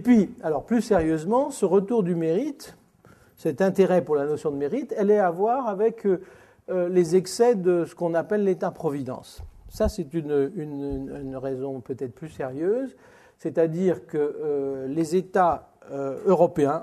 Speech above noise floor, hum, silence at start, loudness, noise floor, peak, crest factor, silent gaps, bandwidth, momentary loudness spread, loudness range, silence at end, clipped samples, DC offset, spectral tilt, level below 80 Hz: 31 dB; none; 0 s; -25 LUFS; -55 dBFS; -6 dBFS; 18 dB; none; 13.5 kHz; 12 LU; 6 LU; 0 s; under 0.1%; under 0.1%; -7 dB/octave; -50 dBFS